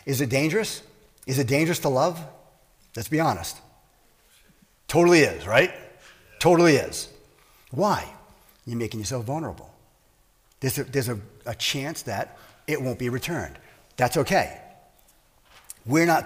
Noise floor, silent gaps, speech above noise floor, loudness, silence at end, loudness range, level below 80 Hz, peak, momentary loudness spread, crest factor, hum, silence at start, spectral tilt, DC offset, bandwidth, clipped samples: -61 dBFS; none; 38 dB; -24 LUFS; 0 s; 9 LU; -54 dBFS; -6 dBFS; 22 LU; 20 dB; none; 0.05 s; -5 dB/octave; under 0.1%; 16 kHz; under 0.1%